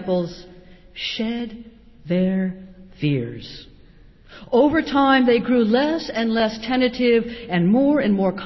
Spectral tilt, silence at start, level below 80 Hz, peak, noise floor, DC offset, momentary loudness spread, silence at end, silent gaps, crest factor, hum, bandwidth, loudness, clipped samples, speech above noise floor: -7 dB/octave; 0 s; -50 dBFS; -6 dBFS; -48 dBFS; under 0.1%; 17 LU; 0 s; none; 16 dB; none; 6 kHz; -20 LUFS; under 0.1%; 28 dB